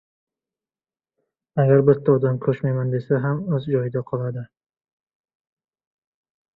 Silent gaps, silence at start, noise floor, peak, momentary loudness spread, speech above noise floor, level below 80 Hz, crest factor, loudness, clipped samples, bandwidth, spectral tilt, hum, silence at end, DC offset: none; 1.55 s; under -90 dBFS; -2 dBFS; 11 LU; over 70 dB; -60 dBFS; 20 dB; -21 LUFS; under 0.1%; 4.1 kHz; -12 dB/octave; none; 2.1 s; under 0.1%